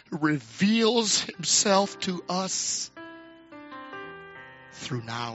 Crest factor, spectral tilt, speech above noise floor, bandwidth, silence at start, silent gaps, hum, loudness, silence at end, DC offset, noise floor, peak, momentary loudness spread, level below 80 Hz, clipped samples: 20 dB; -3 dB/octave; 21 dB; 8.2 kHz; 0.1 s; none; none; -25 LUFS; 0 s; under 0.1%; -47 dBFS; -8 dBFS; 23 LU; -70 dBFS; under 0.1%